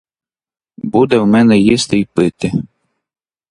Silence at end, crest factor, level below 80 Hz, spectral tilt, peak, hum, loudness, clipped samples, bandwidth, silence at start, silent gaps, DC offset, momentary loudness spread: 0.9 s; 14 dB; -46 dBFS; -6 dB/octave; 0 dBFS; none; -13 LUFS; under 0.1%; 11.5 kHz; 0.85 s; none; under 0.1%; 12 LU